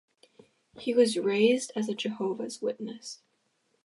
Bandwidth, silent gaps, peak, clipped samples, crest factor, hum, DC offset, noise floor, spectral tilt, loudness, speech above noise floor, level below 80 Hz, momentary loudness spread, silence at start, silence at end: 11.5 kHz; none; -10 dBFS; under 0.1%; 20 dB; none; under 0.1%; -74 dBFS; -4 dB/octave; -28 LUFS; 46 dB; -82 dBFS; 16 LU; 0.75 s; 0.7 s